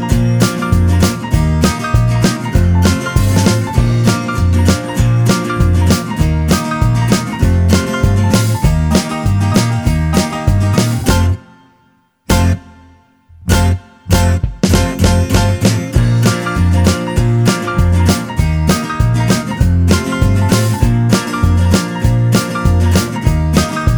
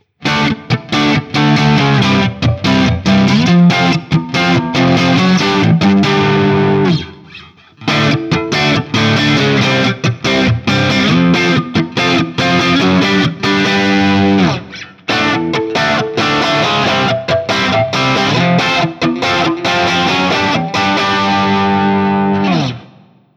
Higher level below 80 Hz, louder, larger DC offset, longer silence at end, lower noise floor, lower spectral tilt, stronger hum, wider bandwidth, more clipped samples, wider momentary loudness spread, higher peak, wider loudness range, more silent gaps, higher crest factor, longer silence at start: first, -20 dBFS vs -40 dBFS; about the same, -13 LUFS vs -12 LUFS; neither; second, 0 s vs 0.5 s; first, -54 dBFS vs -44 dBFS; about the same, -6 dB/octave vs -5.5 dB/octave; neither; first, over 20 kHz vs 12.5 kHz; neither; about the same, 3 LU vs 5 LU; about the same, 0 dBFS vs 0 dBFS; about the same, 3 LU vs 2 LU; neither; about the same, 12 dB vs 12 dB; second, 0 s vs 0.2 s